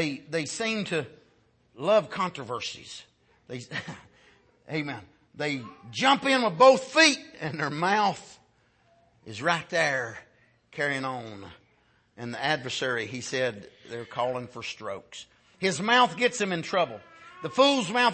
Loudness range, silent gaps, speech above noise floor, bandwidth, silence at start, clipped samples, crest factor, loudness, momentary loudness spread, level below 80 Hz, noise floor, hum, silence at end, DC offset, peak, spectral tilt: 9 LU; none; 39 dB; 8.8 kHz; 0 s; under 0.1%; 22 dB; -26 LUFS; 21 LU; -70 dBFS; -65 dBFS; none; 0 s; under 0.1%; -6 dBFS; -3.5 dB/octave